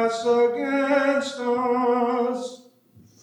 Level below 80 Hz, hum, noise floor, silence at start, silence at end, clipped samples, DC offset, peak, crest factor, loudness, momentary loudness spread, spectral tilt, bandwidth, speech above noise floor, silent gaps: -80 dBFS; none; -54 dBFS; 0 s; 0.65 s; under 0.1%; under 0.1%; -10 dBFS; 14 dB; -22 LUFS; 6 LU; -4 dB/octave; 10.5 kHz; 32 dB; none